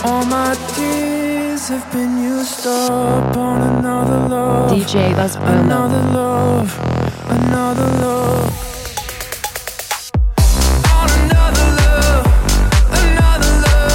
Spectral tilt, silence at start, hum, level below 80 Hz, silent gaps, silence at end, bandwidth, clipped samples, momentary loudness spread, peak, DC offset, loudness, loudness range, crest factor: -5 dB/octave; 0 s; none; -18 dBFS; none; 0 s; 17 kHz; under 0.1%; 8 LU; -2 dBFS; under 0.1%; -15 LUFS; 5 LU; 12 dB